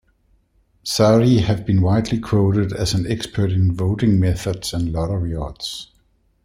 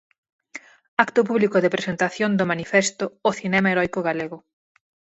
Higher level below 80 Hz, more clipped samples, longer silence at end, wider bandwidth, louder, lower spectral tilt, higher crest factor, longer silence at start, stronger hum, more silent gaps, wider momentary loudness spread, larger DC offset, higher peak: first, -38 dBFS vs -62 dBFS; neither; about the same, 0.6 s vs 0.7 s; first, 15 kHz vs 8.2 kHz; about the same, -19 LUFS vs -21 LUFS; first, -6.5 dB/octave vs -5 dB/octave; about the same, 18 dB vs 22 dB; first, 0.85 s vs 0.55 s; neither; second, none vs 0.88-0.97 s; second, 12 LU vs 20 LU; neither; about the same, -2 dBFS vs 0 dBFS